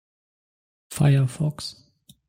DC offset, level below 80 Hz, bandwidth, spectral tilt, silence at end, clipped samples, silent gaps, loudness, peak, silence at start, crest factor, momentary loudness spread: under 0.1%; -56 dBFS; 16 kHz; -6.5 dB/octave; 0.55 s; under 0.1%; none; -22 LUFS; -8 dBFS; 0.9 s; 18 dB; 16 LU